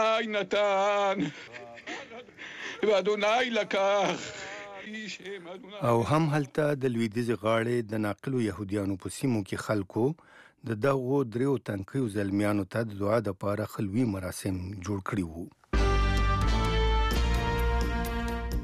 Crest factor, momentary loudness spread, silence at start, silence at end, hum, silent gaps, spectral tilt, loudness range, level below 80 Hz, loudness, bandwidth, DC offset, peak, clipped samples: 14 dB; 14 LU; 0 s; 0 s; none; none; -6 dB/octave; 2 LU; -36 dBFS; -29 LUFS; 15 kHz; under 0.1%; -16 dBFS; under 0.1%